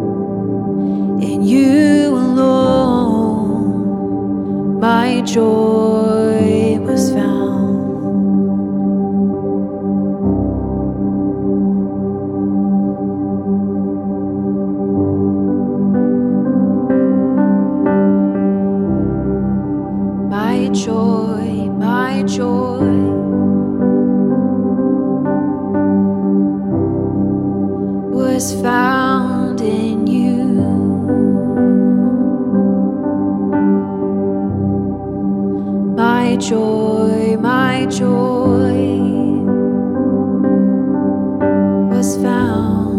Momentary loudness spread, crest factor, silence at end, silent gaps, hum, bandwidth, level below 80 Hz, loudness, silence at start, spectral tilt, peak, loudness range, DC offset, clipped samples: 5 LU; 14 dB; 0 s; none; none; 13 kHz; -40 dBFS; -15 LUFS; 0 s; -7 dB/octave; -2 dBFS; 3 LU; under 0.1%; under 0.1%